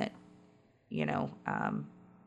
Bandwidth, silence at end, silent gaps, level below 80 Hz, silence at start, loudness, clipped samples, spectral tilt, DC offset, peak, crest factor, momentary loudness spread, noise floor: 8.4 kHz; 0.15 s; none; -72 dBFS; 0 s; -37 LUFS; under 0.1%; -7.5 dB/octave; under 0.1%; -18 dBFS; 20 dB; 13 LU; -64 dBFS